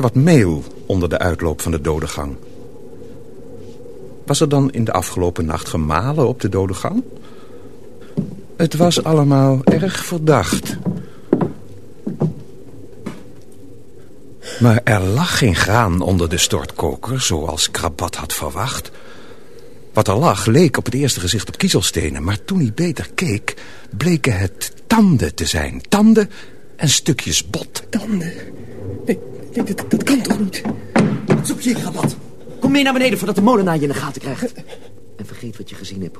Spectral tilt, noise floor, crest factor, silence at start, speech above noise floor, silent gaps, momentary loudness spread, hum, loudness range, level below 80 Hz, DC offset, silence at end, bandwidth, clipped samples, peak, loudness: -5 dB/octave; -42 dBFS; 18 dB; 0 s; 26 dB; none; 19 LU; none; 5 LU; -38 dBFS; 2%; 0 s; 13.5 kHz; under 0.1%; 0 dBFS; -17 LUFS